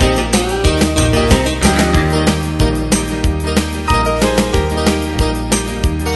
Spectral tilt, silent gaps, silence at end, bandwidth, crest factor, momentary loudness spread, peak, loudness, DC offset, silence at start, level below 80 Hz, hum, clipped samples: -4.5 dB/octave; none; 0 s; 12.5 kHz; 14 dB; 5 LU; 0 dBFS; -14 LUFS; under 0.1%; 0 s; -20 dBFS; none; under 0.1%